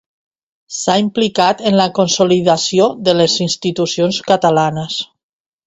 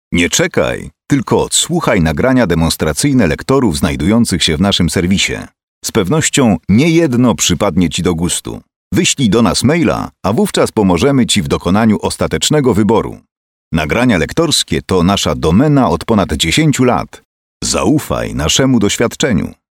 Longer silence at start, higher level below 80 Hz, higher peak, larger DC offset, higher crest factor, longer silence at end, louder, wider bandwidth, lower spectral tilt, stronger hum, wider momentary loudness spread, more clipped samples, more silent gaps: first, 0.7 s vs 0.1 s; second, -54 dBFS vs -32 dBFS; about the same, 0 dBFS vs 0 dBFS; neither; about the same, 14 dB vs 12 dB; first, 0.6 s vs 0.2 s; about the same, -14 LUFS vs -12 LUFS; second, 8.2 kHz vs 17 kHz; about the same, -4.5 dB/octave vs -4.5 dB/octave; neither; about the same, 8 LU vs 6 LU; neither; second, none vs 5.63-5.81 s, 8.76-8.91 s, 13.31-13.71 s, 17.25-17.60 s